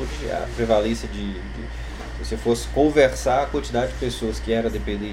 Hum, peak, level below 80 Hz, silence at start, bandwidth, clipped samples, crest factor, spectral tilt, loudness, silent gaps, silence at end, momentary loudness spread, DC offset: none; -2 dBFS; -32 dBFS; 0 s; 15.5 kHz; under 0.1%; 20 dB; -5.5 dB/octave; -23 LUFS; none; 0 s; 15 LU; under 0.1%